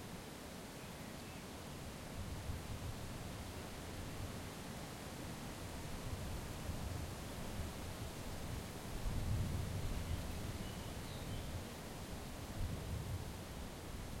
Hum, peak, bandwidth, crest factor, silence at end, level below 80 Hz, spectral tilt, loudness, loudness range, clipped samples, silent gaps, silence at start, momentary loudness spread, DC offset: none; -28 dBFS; 16.5 kHz; 18 dB; 0 s; -50 dBFS; -5 dB/octave; -47 LUFS; 4 LU; under 0.1%; none; 0 s; 6 LU; under 0.1%